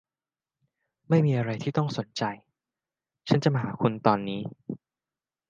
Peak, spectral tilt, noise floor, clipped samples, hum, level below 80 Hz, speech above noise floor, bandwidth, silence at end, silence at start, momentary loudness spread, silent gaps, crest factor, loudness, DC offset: -4 dBFS; -7.5 dB/octave; under -90 dBFS; under 0.1%; none; -68 dBFS; over 64 dB; 7.4 kHz; 0.75 s; 1.1 s; 17 LU; none; 24 dB; -27 LUFS; under 0.1%